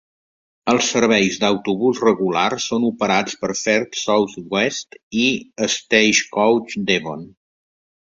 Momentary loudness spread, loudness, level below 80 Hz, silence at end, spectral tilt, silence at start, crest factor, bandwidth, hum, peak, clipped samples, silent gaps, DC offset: 7 LU; -18 LUFS; -58 dBFS; 0.75 s; -3 dB/octave; 0.65 s; 18 dB; 7.8 kHz; none; -2 dBFS; under 0.1%; 5.03-5.11 s; under 0.1%